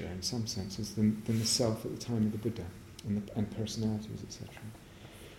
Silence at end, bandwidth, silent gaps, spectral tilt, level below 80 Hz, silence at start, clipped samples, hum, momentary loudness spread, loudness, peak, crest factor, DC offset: 0 s; 16.5 kHz; none; -5 dB/octave; -58 dBFS; 0 s; under 0.1%; none; 17 LU; -34 LUFS; -16 dBFS; 18 dB; under 0.1%